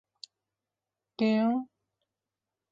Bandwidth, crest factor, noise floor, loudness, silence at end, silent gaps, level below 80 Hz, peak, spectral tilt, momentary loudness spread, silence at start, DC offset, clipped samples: 7.4 kHz; 18 dB; -89 dBFS; -28 LUFS; 1.05 s; none; -78 dBFS; -16 dBFS; -7 dB/octave; 24 LU; 1.2 s; under 0.1%; under 0.1%